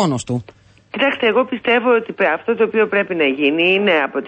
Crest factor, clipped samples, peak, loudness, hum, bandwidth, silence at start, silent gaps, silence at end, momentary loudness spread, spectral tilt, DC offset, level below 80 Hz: 14 dB; under 0.1%; -4 dBFS; -16 LUFS; none; 8.8 kHz; 0 s; none; 0 s; 6 LU; -5 dB/octave; under 0.1%; -58 dBFS